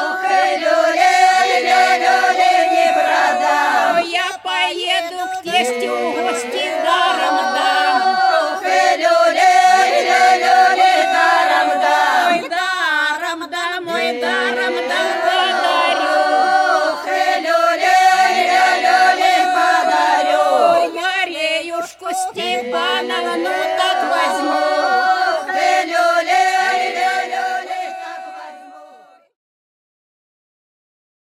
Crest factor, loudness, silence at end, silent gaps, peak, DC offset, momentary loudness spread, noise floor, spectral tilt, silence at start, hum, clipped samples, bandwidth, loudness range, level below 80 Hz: 14 dB; -15 LUFS; 2.45 s; none; -2 dBFS; under 0.1%; 8 LU; -45 dBFS; -0.5 dB/octave; 0 s; none; under 0.1%; 14.5 kHz; 6 LU; -72 dBFS